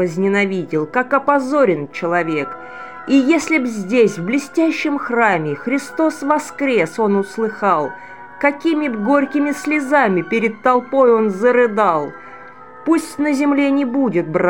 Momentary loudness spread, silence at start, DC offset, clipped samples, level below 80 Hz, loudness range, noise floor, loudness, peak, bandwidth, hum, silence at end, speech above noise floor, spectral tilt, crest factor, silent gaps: 7 LU; 0 s; 0.5%; under 0.1%; -64 dBFS; 2 LU; -38 dBFS; -17 LUFS; 0 dBFS; 17 kHz; none; 0 s; 22 dB; -6 dB/octave; 16 dB; none